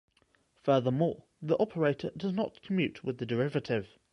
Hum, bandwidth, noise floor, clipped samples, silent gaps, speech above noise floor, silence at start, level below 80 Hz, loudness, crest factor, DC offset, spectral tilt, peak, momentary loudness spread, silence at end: none; 10 kHz; -70 dBFS; under 0.1%; none; 39 dB; 0.65 s; -66 dBFS; -31 LUFS; 18 dB; under 0.1%; -8 dB/octave; -14 dBFS; 7 LU; 0.25 s